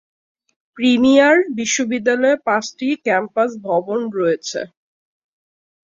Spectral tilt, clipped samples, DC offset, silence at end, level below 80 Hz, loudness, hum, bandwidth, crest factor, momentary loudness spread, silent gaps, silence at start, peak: -3.5 dB/octave; under 0.1%; under 0.1%; 1.2 s; -62 dBFS; -17 LUFS; none; 7.6 kHz; 16 dB; 11 LU; none; 0.75 s; -2 dBFS